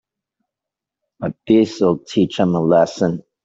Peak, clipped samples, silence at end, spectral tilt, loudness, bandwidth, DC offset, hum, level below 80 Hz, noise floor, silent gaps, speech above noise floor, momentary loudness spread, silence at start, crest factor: -2 dBFS; under 0.1%; 0.25 s; -7 dB/octave; -17 LUFS; 7.8 kHz; under 0.1%; none; -56 dBFS; -86 dBFS; none; 69 dB; 12 LU; 1.2 s; 16 dB